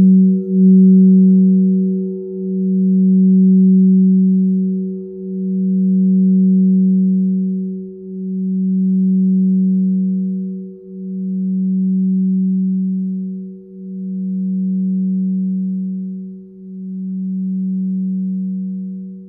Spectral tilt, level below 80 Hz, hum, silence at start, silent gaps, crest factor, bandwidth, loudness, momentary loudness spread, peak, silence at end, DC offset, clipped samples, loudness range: -18 dB/octave; -64 dBFS; 60 Hz at -70 dBFS; 0 s; none; 12 dB; 0.5 kHz; -15 LUFS; 17 LU; -4 dBFS; 0 s; under 0.1%; under 0.1%; 9 LU